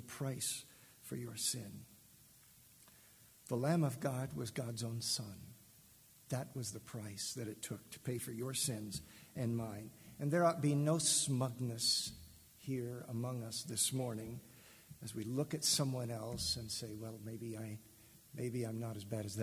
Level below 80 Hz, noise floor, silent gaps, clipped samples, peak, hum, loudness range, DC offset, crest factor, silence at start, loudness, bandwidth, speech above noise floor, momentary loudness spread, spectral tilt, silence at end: -68 dBFS; -64 dBFS; none; under 0.1%; -20 dBFS; none; 8 LU; under 0.1%; 20 dB; 0 s; -39 LUFS; 16 kHz; 24 dB; 19 LU; -4 dB/octave; 0 s